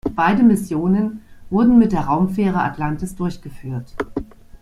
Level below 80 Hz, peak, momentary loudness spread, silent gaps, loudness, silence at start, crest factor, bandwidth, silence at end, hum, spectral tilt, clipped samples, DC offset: -40 dBFS; -2 dBFS; 16 LU; none; -18 LUFS; 0.05 s; 16 dB; 13.5 kHz; 0.05 s; none; -7.5 dB/octave; under 0.1%; under 0.1%